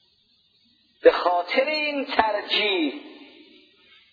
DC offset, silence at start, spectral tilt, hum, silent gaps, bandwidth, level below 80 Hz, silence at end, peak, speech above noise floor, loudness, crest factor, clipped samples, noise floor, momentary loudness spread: under 0.1%; 1.05 s; -4 dB/octave; none; none; 5 kHz; -62 dBFS; 0.9 s; -4 dBFS; 42 dB; -22 LUFS; 22 dB; under 0.1%; -64 dBFS; 6 LU